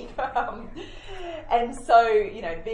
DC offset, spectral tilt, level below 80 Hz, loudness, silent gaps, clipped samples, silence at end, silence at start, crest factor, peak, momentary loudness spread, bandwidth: under 0.1%; -4.5 dB/octave; -44 dBFS; -23 LUFS; none; under 0.1%; 0 s; 0 s; 20 dB; -6 dBFS; 21 LU; 10.5 kHz